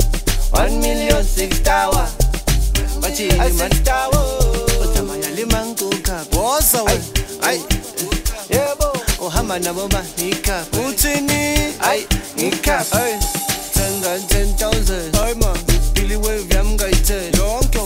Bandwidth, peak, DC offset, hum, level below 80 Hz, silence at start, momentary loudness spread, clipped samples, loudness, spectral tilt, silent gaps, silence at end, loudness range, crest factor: 16.5 kHz; 0 dBFS; under 0.1%; none; -20 dBFS; 0 s; 5 LU; under 0.1%; -18 LUFS; -3.5 dB/octave; none; 0 s; 2 LU; 16 dB